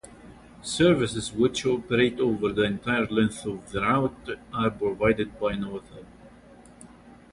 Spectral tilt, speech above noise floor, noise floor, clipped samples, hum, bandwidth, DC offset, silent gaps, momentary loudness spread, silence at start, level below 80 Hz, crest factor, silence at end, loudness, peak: -5.5 dB/octave; 25 dB; -50 dBFS; under 0.1%; none; 11.5 kHz; under 0.1%; none; 11 LU; 0.05 s; -50 dBFS; 18 dB; 0.2 s; -25 LUFS; -8 dBFS